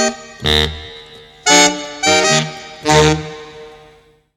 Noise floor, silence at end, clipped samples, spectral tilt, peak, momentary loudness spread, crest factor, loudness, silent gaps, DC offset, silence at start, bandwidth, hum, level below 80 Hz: -48 dBFS; 0.65 s; under 0.1%; -2.5 dB/octave; 0 dBFS; 20 LU; 16 dB; -13 LUFS; none; under 0.1%; 0 s; 16.5 kHz; none; -34 dBFS